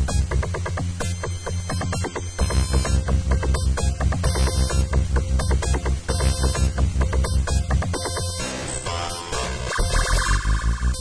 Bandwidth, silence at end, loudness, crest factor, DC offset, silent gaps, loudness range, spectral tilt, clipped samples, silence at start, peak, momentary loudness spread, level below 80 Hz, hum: 11 kHz; 0 s; -23 LUFS; 14 dB; under 0.1%; none; 2 LU; -4.5 dB/octave; under 0.1%; 0 s; -8 dBFS; 6 LU; -24 dBFS; none